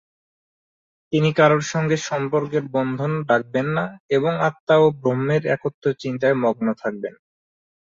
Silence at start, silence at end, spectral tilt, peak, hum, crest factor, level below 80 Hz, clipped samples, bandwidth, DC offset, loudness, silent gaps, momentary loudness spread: 1.1 s; 0.75 s; -6.5 dB/octave; -2 dBFS; none; 20 dB; -62 dBFS; under 0.1%; 7.6 kHz; under 0.1%; -21 LUFS; 4.00-4.09 s, 4.60-4.67 s, 5.74-5.82 s; 8 LU